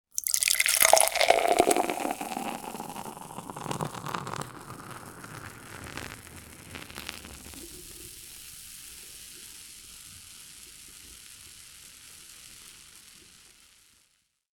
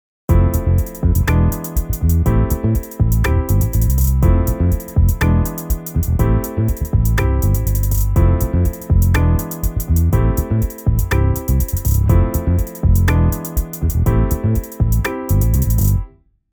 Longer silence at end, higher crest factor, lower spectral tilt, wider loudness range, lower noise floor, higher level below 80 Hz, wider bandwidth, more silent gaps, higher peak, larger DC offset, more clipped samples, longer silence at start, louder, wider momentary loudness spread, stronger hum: first, 1.45 s vs 0.45 s; first, 30 dB vs 14 dB; second, -1.5 dB/octave vs -7 dB/octave; first, 22 LU vs 1 LU; first, -70 dBFS vs -35 dBFS; second, -60 dBFS vs -18 dBFS; about the same, 19 kHz vs over 20 kHz; neither; about the same, -2 dBFS vs -2 dBFS; neither; neither; second, 0.15 s vs 0.3 s; second, -26 LUFS vs -17 LUFS; first, 24 LU vs 5 LU; neither